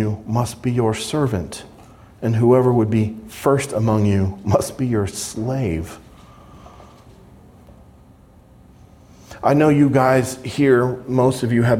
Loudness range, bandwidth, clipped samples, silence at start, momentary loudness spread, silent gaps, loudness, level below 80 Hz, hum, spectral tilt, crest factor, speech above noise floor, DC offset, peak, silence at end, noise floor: 10 LU; 16 kHz; under 0.1%; 0 s; 11 LU; none; -19 LUFS; -48 dBFS; none; -6.5 dB/octave; 18 dB; 30 dB; under 0.1%; -2 dBFS; 0 s; -48 dBFS